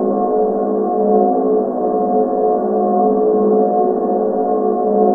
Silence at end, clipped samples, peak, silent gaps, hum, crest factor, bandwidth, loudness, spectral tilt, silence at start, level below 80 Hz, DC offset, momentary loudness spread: 0 s; under 0.1%; 0 dBFS; none; none; 14 dB; 2 kHz; -15 LUFS; -13 dB/octave; 0 s; -56 dBFS; under 0.1%; 3 LU